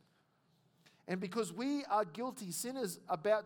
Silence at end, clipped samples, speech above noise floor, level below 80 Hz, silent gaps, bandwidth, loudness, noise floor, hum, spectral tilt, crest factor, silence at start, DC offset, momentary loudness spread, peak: 0 s; under 0.1%; 37 dB; under -90 dBFS; none; 19 kHz; -38 LUFS; -74 dBFS; none; -4.5 dB/octave; 18 dB; 1.05 s; under 0.1%; 8 LU; -20 dBFS